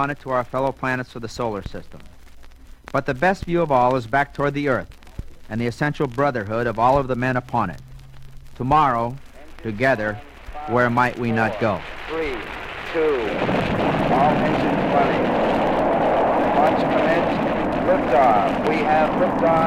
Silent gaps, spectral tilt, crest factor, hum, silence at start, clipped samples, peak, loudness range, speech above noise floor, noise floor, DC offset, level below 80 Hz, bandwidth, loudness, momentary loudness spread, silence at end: none; -7 dB/octave; 16 dB; none; 0 s; under 0.1%; -4 dBFS; 5 LU; 21 dB; -41 dBFS; under 0.1%; -40 dBFS; 15.5 kHz; -20 LUFS; 12 LU; 0 s